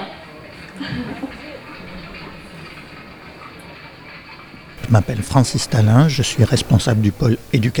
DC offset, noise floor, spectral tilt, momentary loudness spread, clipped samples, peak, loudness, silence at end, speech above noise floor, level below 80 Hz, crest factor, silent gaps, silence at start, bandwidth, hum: under 0.1%; -38 dBFS; -6 dB/octave; 22 LU; under 0.1%; 0 dBFS; -17 LUFS; 0 s; 23 dB; -40 dBFS; 18 dB; none; 0 s; 19.5 kHz; none